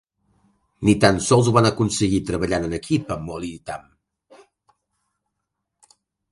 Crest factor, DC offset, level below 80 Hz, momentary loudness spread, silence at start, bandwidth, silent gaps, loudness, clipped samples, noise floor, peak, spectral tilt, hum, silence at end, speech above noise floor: 22 dB; under 0.1%; -44 dBFS; 15 LU; 0.8 s; 11.5 kHz; none; -20 LUFS; under 0.1%; -80 dBFS; 0 dBFS; -5.5 dB/octave; none; 2.5 s; 60 dB